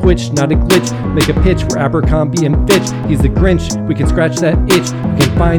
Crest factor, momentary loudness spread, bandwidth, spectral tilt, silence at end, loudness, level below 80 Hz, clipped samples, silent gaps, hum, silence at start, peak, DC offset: 12 dB; 4 LU; 19 kHz; -5.5 dB/octave; 0 s; -13 LUFS; -18 dBFS; 0.2%; none; none; 0 s; 0 dBFS; under 0.1%